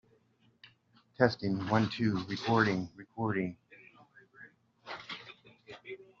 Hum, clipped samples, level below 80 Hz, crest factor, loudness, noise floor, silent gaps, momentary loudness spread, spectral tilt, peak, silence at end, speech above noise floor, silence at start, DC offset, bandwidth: none; under 0.1%; -70 dBFS; 26 dB; -32 LUFS; -69 dBFS; none; 22 LU; -5 dB/octave; -10 dBFS; 0.15 s; 38 dB; 1.2 s; under 0.1%; 7.4 kHz